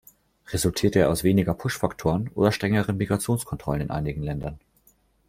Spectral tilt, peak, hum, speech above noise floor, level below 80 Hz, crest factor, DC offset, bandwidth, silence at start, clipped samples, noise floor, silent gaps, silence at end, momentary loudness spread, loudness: -6 dB/octave; -4 dBFS; none; 38 dB; -46 dBFS; 20 dB; under 0.1%; 16 kHz; 0.5 s; under 0.1%; -62 dBFS; none; 0.7 s; 9 LU; -25 LUFS